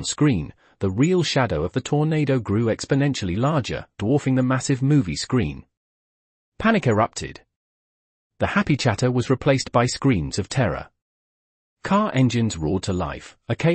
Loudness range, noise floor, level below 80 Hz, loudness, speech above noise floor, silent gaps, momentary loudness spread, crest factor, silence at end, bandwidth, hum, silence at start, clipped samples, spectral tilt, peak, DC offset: 3 LU; under -90 dBFS; -46 dBFS; -22 LUFS; over 69 dB; 5.77-6.52 s, 7.56-8.30 s, 11.02-11.76 s; 9 LU; 18 dB; 0 s; 8.8 kHz; none; 0 s; under 0.1%; -6 dB/octave; -4 dBFS; under 0.1%